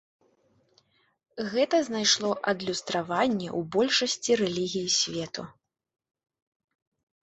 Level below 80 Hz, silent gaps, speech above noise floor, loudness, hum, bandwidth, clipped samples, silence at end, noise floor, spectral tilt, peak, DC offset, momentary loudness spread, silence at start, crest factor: -68 dBFS; none; 40 dB; -26 LUFS; none; 8.4 kHz; under 0.1%; 1.7 s; -67 dBFS; -3 dB/octave; -10 dBFS; under 0.1%; 12 LU; 1.35 s; 18 dB